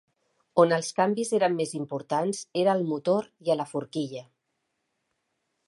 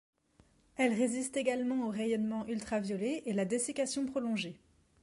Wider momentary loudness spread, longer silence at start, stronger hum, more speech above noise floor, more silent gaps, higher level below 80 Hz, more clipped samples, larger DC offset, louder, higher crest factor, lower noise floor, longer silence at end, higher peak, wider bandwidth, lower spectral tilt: first, 10 LU vs 4 LU; second, 0.55 s vs 0.8 s; neither; first, 53 dB vs 34 dB; neither; second, -78 dBFS vs -70 dBFS; neither; neither; first, -27 LUFS vs -34 LUFS; about the same, 22 dB vs 18 dB; first, -79 dBFS vs -67 dBFS; first, 1.45 s vs 0.45 s; first, -6 dBFS vs -18 dBFS; about the same, 11.5 kHz vs 11.5 kHz; about the same, -5 dB/octave vs -4.5 dB/octave